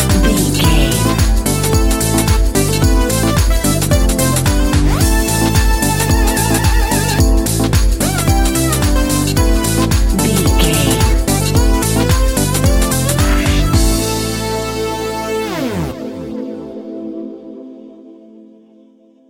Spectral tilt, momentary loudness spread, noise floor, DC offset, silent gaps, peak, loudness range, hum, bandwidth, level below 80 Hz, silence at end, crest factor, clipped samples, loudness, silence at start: -4.5 dB/octave; 11 LU; -47 dBFS; under 0.1%; none; 0 dBFS; 8 LU; none; 17 kHz; -18 dBFS; 1.15 s; 14 dB; under 0.1%; -14 LUFS; 0 s